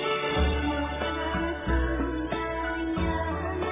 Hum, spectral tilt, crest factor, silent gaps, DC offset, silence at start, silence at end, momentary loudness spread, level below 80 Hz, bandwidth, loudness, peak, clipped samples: none; -10 dB/octave; 14 dB; none; under 0.1%; 0 s; 0 s; 4 LU; -34 dBFS; 3.8 kHz; -29 LUFS; -14 dBFS; under 0.1%